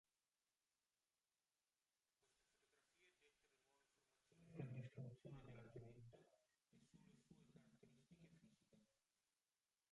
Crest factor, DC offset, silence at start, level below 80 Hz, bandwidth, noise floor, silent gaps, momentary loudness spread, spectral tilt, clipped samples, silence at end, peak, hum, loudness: 24 dB; under 0.1%; 2.25 s; -86 dBFS; 11 kHz; under -90 dBFS; none; 10 LU; -7.5 dB/octave; under 0.1%; 1.1 s; -42 dBFS; none; -60 LUFS